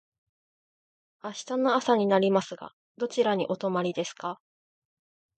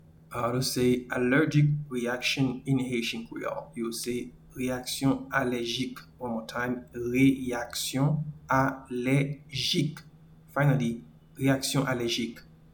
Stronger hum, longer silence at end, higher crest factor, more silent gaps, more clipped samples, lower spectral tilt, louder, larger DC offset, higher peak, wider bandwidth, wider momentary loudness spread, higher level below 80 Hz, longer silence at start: neither; first, 1.05 s vs 0.35 s; about the same, 20 dB vs 18 dB; first, 2.73-2.95 s vs none; neither; about the same, -5 dB/octave vs -5 dB/octave; about the same, -27 LUFS vs -28 LUFS; neither; about the same, -10 dBFS vs -10 dBFS; second, 9 kHz vs 19 kHz; first, 18 LU vs 11 LU; second, -78 dBFS vs -56 dBFS; first, 1.25 s vs 0.3 s